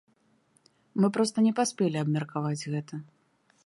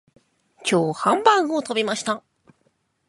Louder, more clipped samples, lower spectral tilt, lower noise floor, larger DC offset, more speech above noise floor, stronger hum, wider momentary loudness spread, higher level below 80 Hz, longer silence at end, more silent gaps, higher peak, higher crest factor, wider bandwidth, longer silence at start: second, -28 LUFS vs -21 LUFS; neither; first, -6 dB/octave vs -4 dB/octave; about the same, -67 dBFS vs -68 dBFS; neither; second, 40 dB vs 47 dB; neither; about the same, 11 LU vs 11 LU; about the same, -76 dBFS vs -72 dBFS; second, 0.65 s vs 0.9 s; neither; second, -14 dBFS vs -2 dBFS; second, 16 dB vs 22 dB; about the same, 11.5 kHz vs 11.5 kHz; first, 0.95 s vs 0.6 s